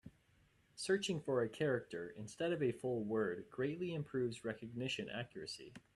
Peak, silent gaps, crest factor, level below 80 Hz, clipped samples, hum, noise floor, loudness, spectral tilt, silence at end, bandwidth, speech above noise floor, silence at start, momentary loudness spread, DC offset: -24 dBFS; none; 18 dB; -76 dBFS; under 0.1%; none; -73 dBFS; -41 LUFS; -5 dB/octave; 0.15 s; 12 kHz; 32 dB; 0.05 s; 11 LU; under 0.1%